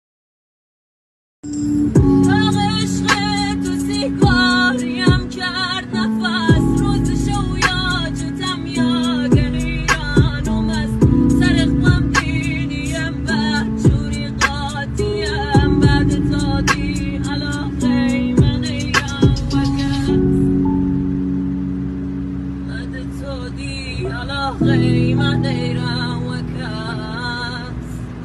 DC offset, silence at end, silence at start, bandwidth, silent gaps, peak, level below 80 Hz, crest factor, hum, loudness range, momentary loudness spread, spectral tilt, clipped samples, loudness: under 0.1%; 0 s; 1.45 s; 12.5 kHz; none; -2 dBFS; -28 dBFS; 16 dB; none; 4 LU; 10 LU; -5.5 dB/octave; under 0.1%; -18 LUFS